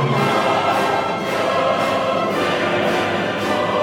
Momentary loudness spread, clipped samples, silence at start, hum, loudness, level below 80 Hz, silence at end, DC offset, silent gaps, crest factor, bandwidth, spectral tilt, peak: 3 LU; under 0.1%; 0 s; none; -18 LUFS; -54 dBFS; 0 s; under 0.1%; none; 14 dB; 18.5 kHz; -5 dB/octave; -6 dBFS